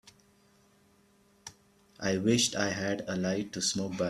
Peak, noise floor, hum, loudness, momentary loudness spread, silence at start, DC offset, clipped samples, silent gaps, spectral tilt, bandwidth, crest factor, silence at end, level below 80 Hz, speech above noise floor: -12 dBFS; -65 dBFS; none; -30 LUFS; 23 LU; 0.05 s; under 0.1%; under 0.1%; none; -3.5 dB/octave; 14 kHz; 22 dB; 0 s; -66 dBFS; 35 dB